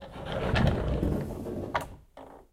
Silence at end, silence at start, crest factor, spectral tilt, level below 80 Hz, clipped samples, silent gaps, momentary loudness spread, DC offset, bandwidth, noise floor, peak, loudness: 0.1 s; 0 s; 18 dB; -7 dB/octave; -38 dBFS; under 0.1%; none; 22 LU; under 0.1%; 16 kHz; -50 dBFS; -12 dBFS; -31 LUFS